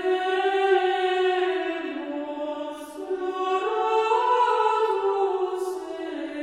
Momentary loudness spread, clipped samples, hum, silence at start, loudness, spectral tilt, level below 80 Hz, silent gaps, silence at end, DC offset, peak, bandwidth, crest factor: 11 LU; under 0.1%; none; 0 s; -25 LUFS; -2.5 dB/octave; -68 dBFS; none; 0 s; under 0.1%; -10 dBFS; 12 kHz; 14 dB